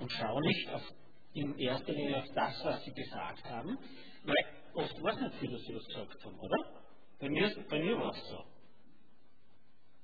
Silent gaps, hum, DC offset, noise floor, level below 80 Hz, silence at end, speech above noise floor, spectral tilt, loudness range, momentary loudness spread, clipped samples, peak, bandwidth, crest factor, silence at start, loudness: none; none; 0.4%; -72 dBFS; -66 dBFS; 1.55 s; 34 dB; -7.5 dB/octave; 2 LU; 14 LU; under 0.1%; -16 dBFS; 5 kHz; 22 dB; 0 s; -37 LUFS